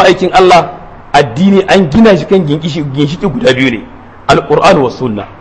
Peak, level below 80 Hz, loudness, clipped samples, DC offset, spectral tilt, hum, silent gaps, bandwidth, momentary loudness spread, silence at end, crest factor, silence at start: 0 dBFS; -34 dBFS; -8 LUFS; 2%; 0.7%; -6 dB/octave; none; none; 11 kHz; 10 LU; 0.05 s; 8 dB; 0 s